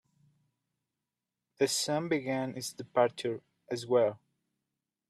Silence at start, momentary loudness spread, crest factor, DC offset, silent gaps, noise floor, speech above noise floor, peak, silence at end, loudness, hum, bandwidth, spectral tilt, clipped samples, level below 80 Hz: 1.6 s; 11 LU; 22 dB; under 0.1%; none; -89 dBFS; 58 dB; -12 dBFS; 0.95 s; -32 LUFS; none; 14 kHz; -4 dB/octave; under 0.1%; -78 dBFS